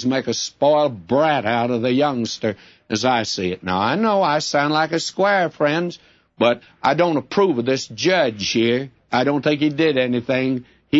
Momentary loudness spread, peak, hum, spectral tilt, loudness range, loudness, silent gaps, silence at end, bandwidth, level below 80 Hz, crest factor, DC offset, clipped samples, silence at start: 6 LU; -4 dBFS; none; -4.5 dB/octave; 1 LU; -19 LUFS; none; 0 s; 8 kHz; -60 dBFS; 16 dB; under 0.1%; under 0.1%; 0 s